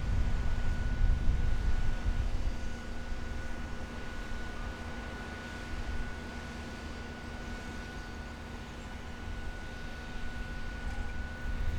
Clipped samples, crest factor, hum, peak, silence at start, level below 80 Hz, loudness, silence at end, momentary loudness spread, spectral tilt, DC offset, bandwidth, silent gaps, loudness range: under 0.1%; 18 dB; none; -16 dBFS; 0 s; -36 dBFS; -39 LUFS; 0 s; 9 LU; -5.5 dB/octave; under 0.1%; 10 kHz; none; 7 LU